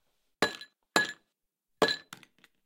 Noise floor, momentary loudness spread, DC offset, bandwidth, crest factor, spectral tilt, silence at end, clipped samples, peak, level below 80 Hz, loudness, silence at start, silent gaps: -82 dBFS; 22 LU; under 0.1%; 17 kHz; 28 dB; -2.5 dB/octave; 0.65 s; under 0.1%; -8 dBFS; -72 dBFS; -31 LUFS; 0.4 s; none